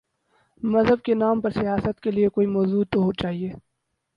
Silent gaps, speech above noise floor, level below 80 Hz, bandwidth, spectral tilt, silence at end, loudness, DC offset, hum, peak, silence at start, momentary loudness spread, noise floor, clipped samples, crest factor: none; 55 dB; -50 dBFS; 6 kHz; -9 dB/octave; 0.6 s; -23 LUFS; under 0.1%; none; -6 dBFS; 0.65 s; 8 LU; -77 dBFS; under 0.1%; 16 dB